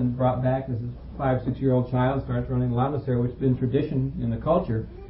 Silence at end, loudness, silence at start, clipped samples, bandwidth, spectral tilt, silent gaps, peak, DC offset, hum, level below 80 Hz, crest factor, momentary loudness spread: 0 s; -25 LUFS; 0 s; under 0.1%; 4.6 kHz; -13 dB/octave; none; -10 dBFS; under 0.1%; none; -42 dBFS; 14 dB; 5 LU